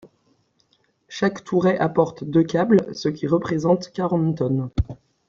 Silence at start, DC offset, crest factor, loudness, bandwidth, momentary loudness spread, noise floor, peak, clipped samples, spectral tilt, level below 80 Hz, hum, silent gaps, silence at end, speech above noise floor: 0.05 s; under 0.1%; 18 dB; -22 LUFS; 7.6 kHz; 8 LU; -65 dBFS; -4 dBFS; under 0.1%; -7.5 dB/octave; -42 dBFS; none; none; 0.35 s; 44 dB